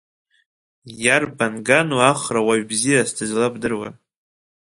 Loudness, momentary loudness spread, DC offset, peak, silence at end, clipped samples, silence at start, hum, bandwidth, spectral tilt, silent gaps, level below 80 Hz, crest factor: -19 LUFS; 8 LU; under 0.1%; 0 dBFS; 0.8 s; under 0.1%; 0.85 s; none; 11.5 kHz; -3.5 dB/octave; none; -58 dBFS; 20 dB